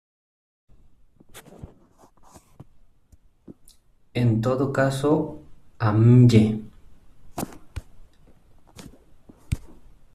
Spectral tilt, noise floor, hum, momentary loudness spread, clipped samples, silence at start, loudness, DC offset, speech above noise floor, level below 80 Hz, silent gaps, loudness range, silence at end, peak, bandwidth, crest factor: -8 dB/octave; -56 dBFS; none; 26 LU; under 0.1%; 1.35 s; -21 LUFS; under 0.1%; 37 dB; -48 dBFS; none; 19 LU; 0.45 s; -4 dBFS; 13 kHz; 22 dB